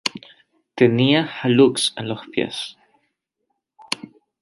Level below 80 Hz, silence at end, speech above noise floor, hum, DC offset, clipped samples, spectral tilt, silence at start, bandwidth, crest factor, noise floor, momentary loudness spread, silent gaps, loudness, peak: -64 dBFS; 0.45 s; 57 dB; none; under 0.1%; under 0.1%; -5 dB/octave; 0.05 s; 11.5 kHz; 20 dB; -76 dBFS; 15 LU; none; -20 LUFS; -2 dBFS